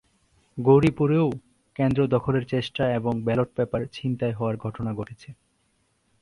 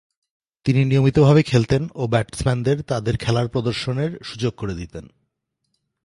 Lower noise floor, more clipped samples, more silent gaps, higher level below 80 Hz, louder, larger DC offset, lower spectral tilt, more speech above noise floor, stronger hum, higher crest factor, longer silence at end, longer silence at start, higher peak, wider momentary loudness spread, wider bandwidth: second, -69 dBFS vs -76 dBFS; neither; neither; second, -52 dBFS vs -44 dBFS; second, -24 LUFS vs -20 LUFS; neither; first, -8.5 dB/octave vs -7 dB/octave; second, 45 dB vs 56 dB; neither; about the same, 20 dB vs 18 dB; about the same, 0.9 s vs 1 s; about the same, 0.55 s vs 0.65 s; second, -6 dBFS vs -2 dBFS; first, 16 LU vs 13 LU; about the same, 11 kHz vs 11.5 kHz